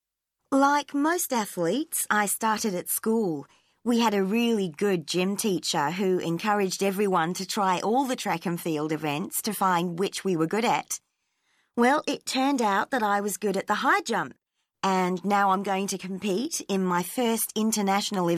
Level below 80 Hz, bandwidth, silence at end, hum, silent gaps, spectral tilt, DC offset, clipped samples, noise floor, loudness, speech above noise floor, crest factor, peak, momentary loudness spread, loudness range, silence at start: -74 dBFS; 16 kHz; 0 s; none; none; -4 dB/octave; under 0.1%; under 0.1%; -81 dBFS; -26 LUFS; 56 dB; 18 dB; -8 dBFS; 6 LU; 1 LU; 0.5 s